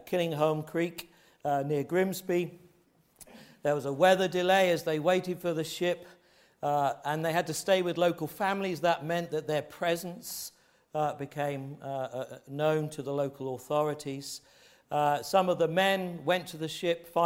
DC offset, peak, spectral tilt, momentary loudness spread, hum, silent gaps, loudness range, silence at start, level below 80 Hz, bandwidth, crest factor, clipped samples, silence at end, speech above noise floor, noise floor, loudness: under 0.1%; -10 dBFS; -5 dB/octave; 12 LU; none; none; 6 LU; 0.05 s; -72 dBFS; 16.5 kHz; 20 dB; under 0.1%; 0 s; 36 dB; -66 dBFS; -30 LUFS